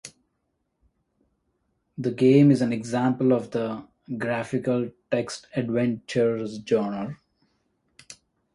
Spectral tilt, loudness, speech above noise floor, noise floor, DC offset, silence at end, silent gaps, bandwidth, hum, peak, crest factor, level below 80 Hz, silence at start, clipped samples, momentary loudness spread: -7 dB/octave; -24 LUFS; 52 dB; -76 dBFS; under 0.1%; 0.4 s; none; 11.5 kHz; none; -6 dBFS; 20 dB; -64 dBFS; 0.05 s; under 0.1%; 16 LU